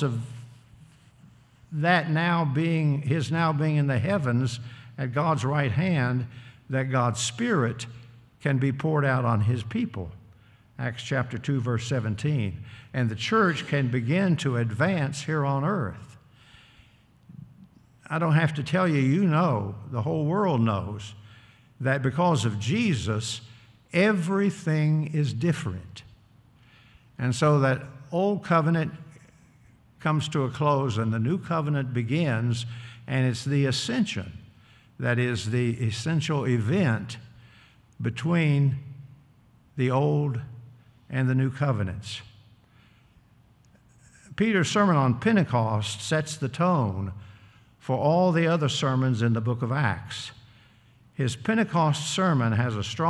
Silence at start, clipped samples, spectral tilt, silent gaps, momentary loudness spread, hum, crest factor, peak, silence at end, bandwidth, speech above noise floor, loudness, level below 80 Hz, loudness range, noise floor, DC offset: 0 s; under 0.1%; -6.5 dB/octave; none; 12 LU; none; 18 dB; -8 dBFS; 0 s; 11.5 kHz; 33 dB; -26 LUFS; -62 dBFS; 4 LU; -58 dBFS; under 0.1%